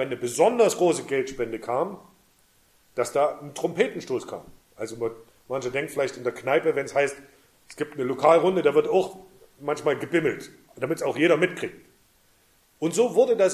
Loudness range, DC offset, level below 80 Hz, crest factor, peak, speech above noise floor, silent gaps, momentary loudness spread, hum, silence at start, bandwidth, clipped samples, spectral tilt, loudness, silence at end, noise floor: 5 LU; under 0.1%; -66 dBFS; 20 dB; -4 dBFS; 38 dB; none; 15 LU; none; 0 s; 15 kHz; under 0.1%; -4.5 dB/octave; -25 LUFS; 0 s; -62 dBFS